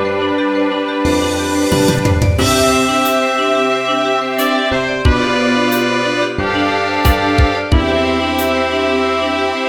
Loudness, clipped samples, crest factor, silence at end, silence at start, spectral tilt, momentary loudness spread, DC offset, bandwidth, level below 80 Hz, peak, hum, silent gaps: -14 LUFS; under 0.1%; 14 dB; 0 s; 0 s; -4.5 dB/octave; 3 LU; 0.3%; 19 kHz; -26 dBFS; 0 dBFS; none; none